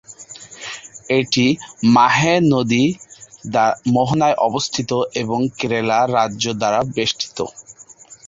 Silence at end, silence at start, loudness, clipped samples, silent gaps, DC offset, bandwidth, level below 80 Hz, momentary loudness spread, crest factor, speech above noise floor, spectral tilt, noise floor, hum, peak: 0.15 s; 0.1 s; -17 LUFS; under 0.1%; none; under 0.1%; 7.8 kHz; -54 dBFS; 17 LU; 16 dB; 27 dB; -4.5 dB/octave; -44 dBFS; none; -2 dBFS